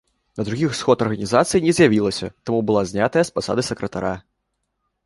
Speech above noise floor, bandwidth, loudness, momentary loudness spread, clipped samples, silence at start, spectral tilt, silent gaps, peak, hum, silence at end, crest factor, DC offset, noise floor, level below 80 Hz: 55 dB; 11.5 kHz; -20 LUFS; 12 LU; under 0.1%; 0.35 s; -5.5 dB/octave; none; -2 dBFS; none; 0.85 s; 18 dB; under 0.1%; -75 dBFS; -50 dBFS